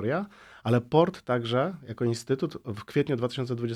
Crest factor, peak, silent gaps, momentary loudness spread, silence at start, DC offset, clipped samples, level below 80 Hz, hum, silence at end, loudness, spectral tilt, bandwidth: 20 dB; -8 dBFS; none; 9 LU; 0 s; under 0.1%; under 0.1%; -64 dBFS; none; 0 s; -28 LUFS; -7 dB/octave; 13.5 kHz